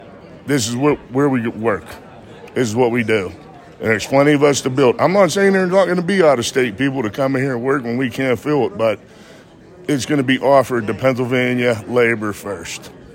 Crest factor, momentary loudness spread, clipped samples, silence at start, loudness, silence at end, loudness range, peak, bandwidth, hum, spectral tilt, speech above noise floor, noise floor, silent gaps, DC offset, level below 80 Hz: 16 dB; 12 LU; under 0.1%; 0 s; -17 LUFS; 0 s; 5 LU; -2 dBFS; 16.5 kHz; none; -5 dB/octave; 26 dB; -42 dBFS; none; under 0.1%; -54 dBFS